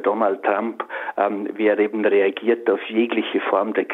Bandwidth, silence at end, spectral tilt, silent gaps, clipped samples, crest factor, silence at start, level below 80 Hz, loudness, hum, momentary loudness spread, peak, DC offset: 4.1 kHz; 0 s; -7.5 dB/octave; none; under 0.1%; 16 dB; 0 s; -74 dBFS; -21 LUFS; none; 5 LU; -4 dBFS; under 0.1%